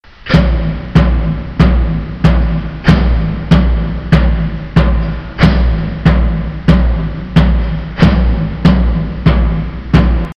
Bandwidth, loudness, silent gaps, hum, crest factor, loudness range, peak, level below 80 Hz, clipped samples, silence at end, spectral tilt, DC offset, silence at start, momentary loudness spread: 6.4 kHz; -13 LUFS; none; none; 10 dB; 1 LU; 0 dBFS; -14 dBFS; 0.7%; 0.05 s; -8.5 dB/octave; under 0.1%; 0.25 s; 6 LU